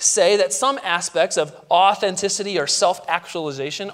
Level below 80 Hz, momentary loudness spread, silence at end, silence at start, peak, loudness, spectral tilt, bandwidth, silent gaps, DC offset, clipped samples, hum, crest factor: -70 dBFS; 9 LU; 0 s; 0 s; -2 dBFS; -19 LUFS; -1.5 dB/octave; 16 kHz; none; under 0.1%; under 0.1%; none; 18 dB